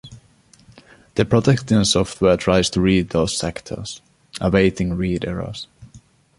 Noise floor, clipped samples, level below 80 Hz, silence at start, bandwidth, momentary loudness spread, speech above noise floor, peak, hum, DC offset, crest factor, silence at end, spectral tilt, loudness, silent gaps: -53 dBFS; under 0.1%; -40 dBFS; 0.05 s; 11.5 kHz; 15 LU; 34 dB; 0 dBFS; none; under 0.1%; 20 dB; 0.4 s; -5.5 dB/octave; -19 LUFS; none